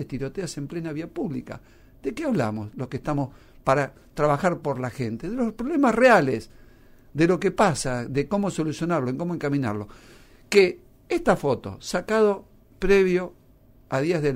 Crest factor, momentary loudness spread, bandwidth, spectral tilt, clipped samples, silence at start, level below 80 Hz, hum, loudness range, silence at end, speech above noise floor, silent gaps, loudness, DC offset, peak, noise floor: 18 dB; 13 LU; 16 kHz; -6 dB/octave; under 0.1%; 0 s; -46 dBFS; none; 6 LU; 0 s; 30 dB; none; -24 LUFS; under 0.1%; -6 dBFS; -54 dBFS